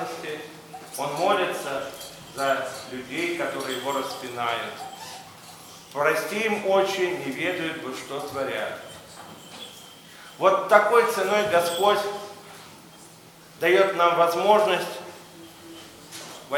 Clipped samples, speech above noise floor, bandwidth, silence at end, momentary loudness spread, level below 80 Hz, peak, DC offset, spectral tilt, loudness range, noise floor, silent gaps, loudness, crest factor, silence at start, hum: under 0.1%; 25 dB; 19.5 kHz; 0 s; 23 LU; -68 dBFS; -2 dBFS; under 0.1%; -3.5 dB/octave; 7 LU; -49 dBFS; none; -24 LUFS; 24 dB; 0 s; none